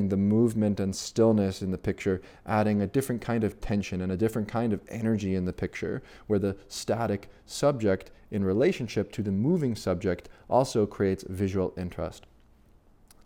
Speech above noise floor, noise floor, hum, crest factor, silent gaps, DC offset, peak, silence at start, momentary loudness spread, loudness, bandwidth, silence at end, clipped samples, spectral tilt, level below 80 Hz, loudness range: 31 dB; -58 dBFS; none; 18 dB; none; under 0.1%; -10 dBFS; 0 s; 10 LU; -28 LUFS; 16.5 kHz; 1.05 s; under 0.1%; -6.5 dB/octave; -52 dBFS; 3 LU